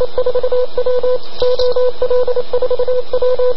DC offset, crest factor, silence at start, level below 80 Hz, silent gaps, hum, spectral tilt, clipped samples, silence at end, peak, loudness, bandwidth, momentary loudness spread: 30%; 12 dB; 0 s; -38 dBFS; none; none; -6 dB/octave; under 0.1%; 0 s; 0 dBFS; -16 LUFS; 6 kHz; 3 LU